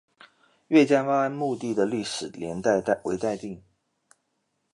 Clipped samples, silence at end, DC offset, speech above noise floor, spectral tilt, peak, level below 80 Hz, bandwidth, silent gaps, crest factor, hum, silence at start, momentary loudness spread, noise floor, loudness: under 0.1%; 1.15 s; under 0.1%; 51 dB; -5.5 dB/octave; -8 dBFS; -64 dBFS; 11 kHz; none; 20 dB; none; 0.7 s; 13 LU; -76 dBFS; -25 LUFS